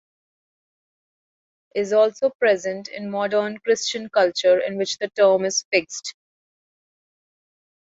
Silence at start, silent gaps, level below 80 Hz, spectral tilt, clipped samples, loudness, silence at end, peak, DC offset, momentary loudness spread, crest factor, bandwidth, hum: 1.75 s; 2.35-2.39 s, 5.65-5.71 s; -72 dBFS; -2.5 dB/octave; under 0.1%; -21 LUFS; 1.85 s; -6 dBFS; under 0.1%; 12 LU; 18 dB; 8 kHz; none